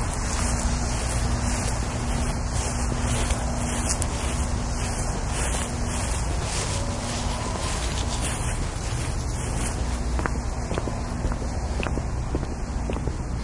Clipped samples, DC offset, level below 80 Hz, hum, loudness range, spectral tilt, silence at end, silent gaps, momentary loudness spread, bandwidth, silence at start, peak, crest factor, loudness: under 0.1%; under 0.1%; -28 dBFS; none; 2 LU; -4.5 dB/octave; 0 s; none; 4 LU; 11.5 kHz; 0 s; -4 dBFS; 22 dB; -27 LUFS